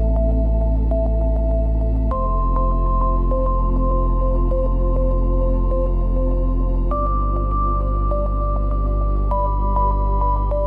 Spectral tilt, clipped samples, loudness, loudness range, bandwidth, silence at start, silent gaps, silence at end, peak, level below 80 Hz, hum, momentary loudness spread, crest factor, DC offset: -12 dB/octave; under 0.1%; -21 LUFS; 1 LU; 1.5 kHz; 0 s; none; 0 s; -8 dBFS; -18 dBFS; none; 2 LU; 10 dB; under 0.1%